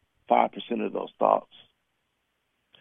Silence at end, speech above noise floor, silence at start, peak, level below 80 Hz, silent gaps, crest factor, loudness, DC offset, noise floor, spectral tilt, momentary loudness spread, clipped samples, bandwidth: 1.4 s; 49 dB; 0.3 s; -4 dBFS; -78 dBFS; none; 24 dB; -26 LUFS; under 0.1%; -76 dBFS; -8 dB/octave; 7 LU; under 0.1%; 3.8 kHz